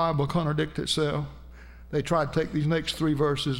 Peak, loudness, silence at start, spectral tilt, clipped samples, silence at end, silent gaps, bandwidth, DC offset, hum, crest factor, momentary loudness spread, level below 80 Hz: -12 dBFS; -27 LUFS; 0 s; -6 dB/octave; under 0.1%; 0 s; none; 16 kHz; under 0.1%; none; 16 dB; 6 LU; -46 dBFS